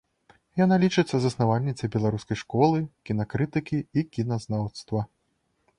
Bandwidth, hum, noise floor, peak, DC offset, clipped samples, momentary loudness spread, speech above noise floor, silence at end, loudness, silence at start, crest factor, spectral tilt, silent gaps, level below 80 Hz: 10.5 kHz; none; -73 dBFS; -8 dBFS; under 0.1%; under 0.1%; 9 LU; 48 dB; 0.75 s; -26 LUFS; 0.55 s; 18 dB; -7 dB/octave; none; -56 dBFS